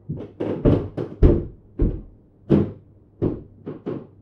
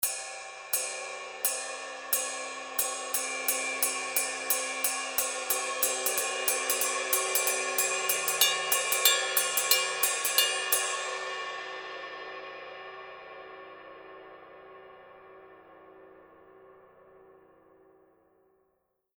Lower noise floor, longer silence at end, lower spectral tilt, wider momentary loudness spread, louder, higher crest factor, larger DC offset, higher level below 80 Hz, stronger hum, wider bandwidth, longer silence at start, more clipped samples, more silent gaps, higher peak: second, -46 dBFS vs -76 dBFS; second, 0.2 s vs 1.9 s; first, -11 dB/octave vs 2 dB/octave; second, 16 LU vs 19 LU; first, -23 LUFS vs -27 LUFS; second, 22 dB vs 28 dB; neither; first, -28 dBFS vs -74 dBFS; neither; second, 5.4 kHz vs over 20 kHz; about the same, 0.1 s vs 0 s; neither; neither; first, 0 dBFS vs -4 dBFS